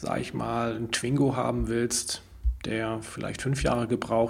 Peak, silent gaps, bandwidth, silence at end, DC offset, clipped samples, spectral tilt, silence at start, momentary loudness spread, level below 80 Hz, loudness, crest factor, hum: -12 dBFS; none; 16 kHz; 0 s; under 0.1%; under 0.1%; -5 dB/octave; 0 s; 8 LU; -38 dBFS; -29 LUFS; 16 dB; none